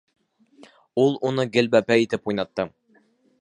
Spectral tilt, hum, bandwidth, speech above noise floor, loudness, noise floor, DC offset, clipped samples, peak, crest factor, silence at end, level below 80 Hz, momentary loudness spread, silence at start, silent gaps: -6 dB/octave; none; 11 kHz; 40 dB; -22 LUFS; -61 dBFS; under 0.1%; under 0.1%; -4 dBFS; 20 dB; 0.7 s; -62 dBFS; 11 LU; 0.95 s; none